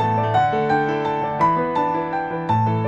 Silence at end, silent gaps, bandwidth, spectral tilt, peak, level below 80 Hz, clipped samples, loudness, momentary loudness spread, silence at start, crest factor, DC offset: 0 s; none; 7.8 kHz; -8 dB/octave; -6 dBFS; -52 dBFS; under 0.1%; -20 LUFS; 4 LU; 0 s; 14 dB; under 0.1%